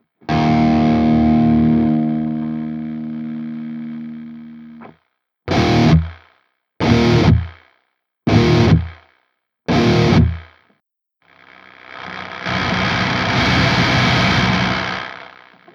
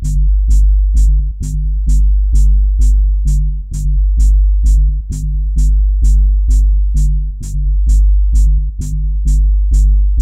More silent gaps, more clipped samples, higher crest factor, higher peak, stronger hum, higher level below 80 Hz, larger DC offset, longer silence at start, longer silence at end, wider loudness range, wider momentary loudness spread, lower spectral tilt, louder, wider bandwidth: neither; neither; first, 18 dB vs 8 dB; about the same, 0 dBFS vs -2 dBFS; neither; second, -32 dBFS vs -10 dBFS; neither; first, 0.3 s vs 0 s; first, 0.5 s vs 0 s; first, 6 LU vs 1 LU; first, 18 LU vs 7 LU; about the same, -6.5 dB/octave vs -7 dB/octave; about the same, -16 LUFS vs -15 LUFS; second, 7.6 kHz vs 9 kHz